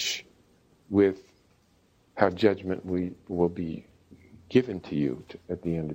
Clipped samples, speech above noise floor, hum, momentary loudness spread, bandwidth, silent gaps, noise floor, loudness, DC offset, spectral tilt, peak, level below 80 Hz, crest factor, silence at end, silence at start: under 0.1%; 37 dB; none; 14 LU; 16 kHz; none; -64 dBFS; -28 LUFS; under 0.1%; -5.5 dB/octave; -6 dBFS; -58 dBFS; 24 dB; 0 s; 0 s